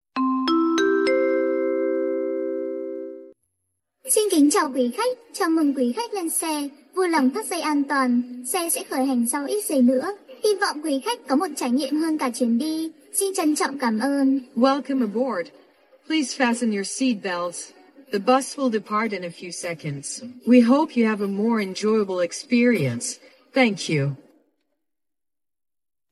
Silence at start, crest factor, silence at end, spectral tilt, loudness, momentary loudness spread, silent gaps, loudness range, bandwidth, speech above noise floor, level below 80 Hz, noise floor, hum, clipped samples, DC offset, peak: 0.15 s; 18 dB; 1.95 s; -4 dB/octave; -23 LUFS; 11 LU; none; 3 LU; 13.5 kHz; over 68 dB; -72 dBFS; under -90 dBFS; none; under 0.1%; under 0.1%; -4 dBFS